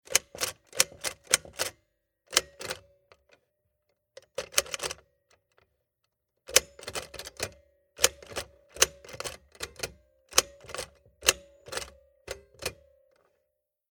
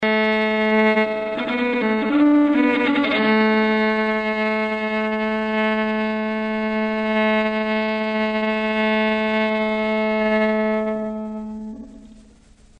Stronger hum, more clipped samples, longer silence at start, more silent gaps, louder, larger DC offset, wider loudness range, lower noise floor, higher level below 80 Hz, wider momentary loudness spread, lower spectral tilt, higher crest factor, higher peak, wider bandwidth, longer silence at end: neither; neither; about the same, 0.1 s vs 0 s; neither; second, -30 LUFS vs -20 LUFS; neither; first, 7 LU vs 3 LU; first, -81 dBFS vs -50 dBFS; second, -58 dBFS vs -52 dBFS; first, 15 LU vs 7 LU; second, 0.5 dB/octave vs -7 dB/octave; first, 34 dB vs 12 dB; first, 0 dBFS vs -8 dBFS; first, 19.5 kHz vs 8.2 kHz; first, 1.2 s vs 0.6 s